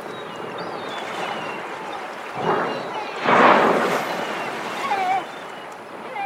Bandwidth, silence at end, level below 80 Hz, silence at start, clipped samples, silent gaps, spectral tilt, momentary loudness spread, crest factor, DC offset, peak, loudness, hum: 16.5 kHz; 0 s; -68 dBFS; 0 s; under 0.1%; none; -4.5 dB/octave; 18 LU; 22 dB; under 0.1%; 0 dBFS; -22 LUFS; none